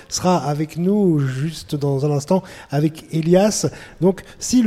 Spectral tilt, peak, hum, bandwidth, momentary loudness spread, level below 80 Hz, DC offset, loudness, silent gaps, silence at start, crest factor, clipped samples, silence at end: -6 dB/octave; -4 dBFS; none; 15 kHz; 9 LU; -48 dBFS; under 0.1%; -20 LUFS; none; 0.1 s; 16 dB; under 0.1%; 0 s